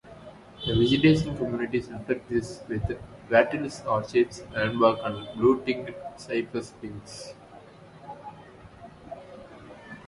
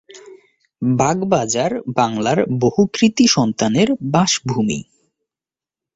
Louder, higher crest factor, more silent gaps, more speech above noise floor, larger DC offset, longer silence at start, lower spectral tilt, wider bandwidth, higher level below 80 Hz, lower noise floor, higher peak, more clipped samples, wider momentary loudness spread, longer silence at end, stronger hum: second, -26 LUFS vs -17 LUFS; first, 22 dB vs 16 dB; neither; second, 23 dB vs over 74 dB; neither; about the same, 0.05 s vs 0.15 s; first, -6.5 dB/octave vs -4.5 dB/octave; first, 11.5 kHz vs 8 kHz; about the same, -50 dBFS vs -52 dBFS; second, -49 dBFS vs under -90 dBFS; second, -6 dBFS vs -2 dBFS; neither; first, 24 LU vs 6 LU; second, 0.05 s vs 1.15 s; neither